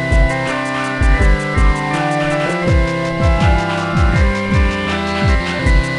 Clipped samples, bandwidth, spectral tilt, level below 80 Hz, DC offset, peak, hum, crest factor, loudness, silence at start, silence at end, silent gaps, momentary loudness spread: under 0.1%; 11 kHz; -6 dB/octave; -18 dBFS; under 0.1%; 0 dBFS; none; 14 dB; -16 LUFS; 0 s; 0 s; none; 4 LU